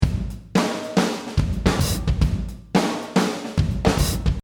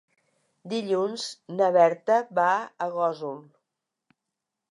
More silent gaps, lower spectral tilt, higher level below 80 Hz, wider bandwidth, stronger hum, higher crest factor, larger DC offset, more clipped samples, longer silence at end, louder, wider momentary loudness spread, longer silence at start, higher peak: neither; about the same, -5.5 dB/octave vs -4.5 dB/octave; first, -28 dBFS vs -86 dBFS; first, over 20 kHz vs 11.5 kHz; neither; about the same, 18 dB vs 20 dB; neither; neither; second, 0.05 s vs 1.3 s; about the same, -23 LUFS vs -25 LUFS; second, 3 LU vs 14 LU; second, 0 s vs 0.65 s; first, -2 dBFS vs -8 dBFS